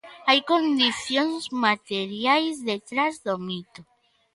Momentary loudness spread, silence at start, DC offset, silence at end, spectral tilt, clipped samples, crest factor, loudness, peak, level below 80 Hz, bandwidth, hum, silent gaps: 10 LU; 0.05 s; under 0.1%; 0.55 s; -3.5 dB/octave; under 0.1%; 20 dB; -24 LUFS; -4 dBFS; -70 dBFS; 11.5 kHz; none; none